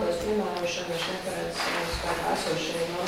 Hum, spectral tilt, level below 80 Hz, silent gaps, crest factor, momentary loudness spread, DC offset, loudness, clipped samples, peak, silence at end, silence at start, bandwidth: none; -3.5 dB/octave; -48 dBFS; none; 14 dB; 3 LU; under 0.1%; -29 LUFS; under 0.1%; -14 dBFS; 0 s; 0 s; 16.5 kHz